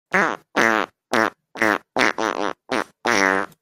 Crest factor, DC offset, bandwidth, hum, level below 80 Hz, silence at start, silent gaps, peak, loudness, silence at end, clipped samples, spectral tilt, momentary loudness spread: 20 dB; under 0.1%; 16.5 kHz; none; -62 dBFS; 0.1 s; none; -2 dBFS; -21 LUFS; 0.15 s; under 0.1%; -3 dB/octave; 6 LU